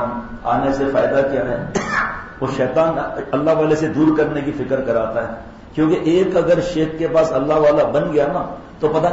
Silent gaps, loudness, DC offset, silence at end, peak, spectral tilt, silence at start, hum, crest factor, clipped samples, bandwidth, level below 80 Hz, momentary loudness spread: none; -18 LUFS; 0.1%; 0 s; -6 dBFS; -7 dB/octave; 0 s; none; 12 dB; under 0.1%; 8 kHz; -42 dBFS; 9 LU